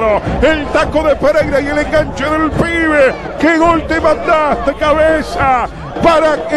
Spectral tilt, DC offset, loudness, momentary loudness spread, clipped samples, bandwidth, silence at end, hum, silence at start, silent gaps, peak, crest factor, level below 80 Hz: -6 dB/octave; under 0.1%; -12 LUFS; 4 LU; under 0.1%; 12 kHz; 0 s; none; 0 s; none; 0 dBFS; 12 dB; -28 dBFS